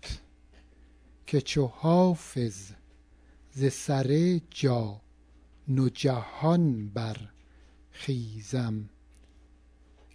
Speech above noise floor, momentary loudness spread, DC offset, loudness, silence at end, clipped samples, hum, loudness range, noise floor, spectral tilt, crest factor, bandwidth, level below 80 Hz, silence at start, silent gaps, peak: 30 dB; 19 LU; under 0.1%; -28 LUFS; 1.25 s; under 0.1%; none; 4 LU; -58 dBFS; -7 dB/octave; 18 dB; 11 kHz; -54 dBFS; 0 s; none; -12 dBFS